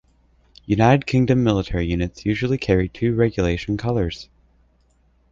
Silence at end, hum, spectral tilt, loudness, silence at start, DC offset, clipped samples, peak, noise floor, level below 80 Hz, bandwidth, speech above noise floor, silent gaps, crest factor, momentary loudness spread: 1.1 s; none; -7.5 dB/octave; -20 LUFS; 0.7 s; under 0.1%; under 0.1%; -2 dBFS; -60 dBFS; -36 dBFS; 7.6 kHz; 40 dB; none; 18 dB; 8 LU